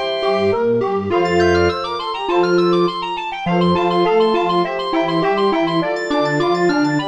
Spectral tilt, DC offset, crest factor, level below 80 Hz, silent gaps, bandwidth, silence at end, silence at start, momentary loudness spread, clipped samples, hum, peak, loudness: -6.5 dB/octave; under 0.1%; 12 dB; -48 dBFS; none; 8.8 kHz; 0 s; 0 s; 5 LU; under 0.1%; none; -4 dBFS; -17 LUFS